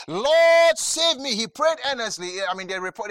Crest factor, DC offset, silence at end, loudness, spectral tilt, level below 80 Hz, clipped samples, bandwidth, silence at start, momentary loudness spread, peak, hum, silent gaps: 16 dB; under 0.1%; 0 s; -20 LUFS; -1 dB/octave; -66 dBFS; under 0.1%; 16 kHz; 0 s; 12 LU; -6 dBFS; none; none